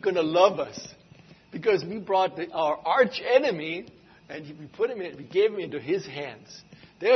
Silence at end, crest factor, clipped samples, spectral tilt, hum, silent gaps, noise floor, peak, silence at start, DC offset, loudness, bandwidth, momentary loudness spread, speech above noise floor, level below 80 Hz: 0 s; 20 dB; under 0.1%; -5 dB/octave; none; none; -53 dBFS; -6 dBFS; 0.05 s; under 0.1%; -26 LUFS; 6.4 kHz; 20 LU; 27 dB; -70 dBFS